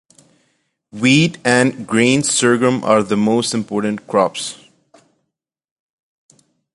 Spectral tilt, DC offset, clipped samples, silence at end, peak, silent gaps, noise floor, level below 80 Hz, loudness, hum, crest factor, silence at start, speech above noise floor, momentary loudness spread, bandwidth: -4 dB/octave; under 0.1%; under 0.1%; 2.2 s; 0 dBFS; none; -78 dBFS; -58 dBFS; -15 LUFS; none; 18 dB; 0.95 s; 62 dB; 7 LU; 11.5 kHz